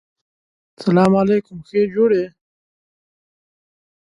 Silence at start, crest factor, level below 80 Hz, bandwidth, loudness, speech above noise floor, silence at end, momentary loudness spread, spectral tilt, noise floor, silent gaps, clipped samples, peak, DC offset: 0.8 s; 18 dB; -58 dBFS; 11 kHz; -17 LUFS; over 74 dB; 1.85 s; 10 LU; -8.5 dB/octave; under -90 dBFS; none; under 0.1%; -2 dBFS; under 0.1%